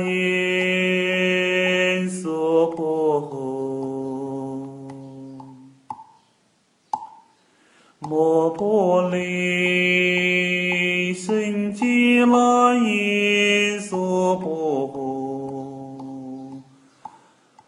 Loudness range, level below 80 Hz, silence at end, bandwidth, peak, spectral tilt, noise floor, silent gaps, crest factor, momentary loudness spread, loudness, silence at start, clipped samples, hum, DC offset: 15 LU; -68 dBFS; 0.6 s; 14.5 kHz; -6 dBFS; -5 dB/octave; -63 dBFS; none; 16 dB; 19 LU; -20 LUFS; 0 s; under 0.1%; none; under 0.1%